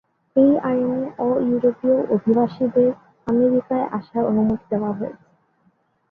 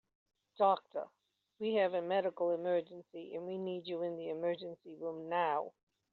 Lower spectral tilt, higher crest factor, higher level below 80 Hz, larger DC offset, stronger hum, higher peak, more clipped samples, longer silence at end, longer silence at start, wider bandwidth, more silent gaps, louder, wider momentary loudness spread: first, -10.5 dB/octave vs -3.5 dB/octave; second, 14 dB vs 20 dB; first, -58 dBFS vs -88 dBFS; neither; neither; first, -6 dBFS vs -18 dBFS; neither; first, 0.95 s vs 0.4 s; second, 0.35 s vs 0.6 s; about the same, 4.6 kHz vs 4.6 kHz; neither; first, -20 LUFS vs -37 LUFS; second, 7 LU vs 14 LU